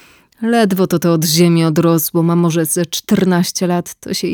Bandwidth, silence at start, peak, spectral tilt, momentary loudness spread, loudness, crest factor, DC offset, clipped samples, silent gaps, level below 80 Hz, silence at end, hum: over 20 kHz; 0.4 s; -2 dBFS; -5 dB/octave; 7 LU; -14 LUFS; 12 dB; under 0.1%; under 0.1%; none; -54 dBFS; 0 s; none